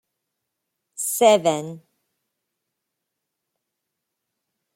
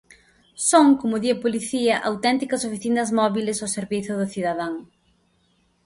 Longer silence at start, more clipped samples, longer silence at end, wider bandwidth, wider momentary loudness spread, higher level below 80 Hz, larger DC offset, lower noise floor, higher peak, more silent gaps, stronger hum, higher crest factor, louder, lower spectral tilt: first, 1 s vs 0.6 s; neither; first, 3 s vs 1 s; first, 16.5 kHz vs 11.5 kHz; first, 21 LU vs 10 LU; second, -74 dBFS vs -62 dBFS; neither; first, -81 dBFS vs -64 dBFS; about the same, -4 dBFS vs -2 dBFS; neither; neither; about the same, 22 dB vs 20 dB; first, -19 LUFS vs -22 LUFS; about the same, -3 dB/octave vs -4 dB/octave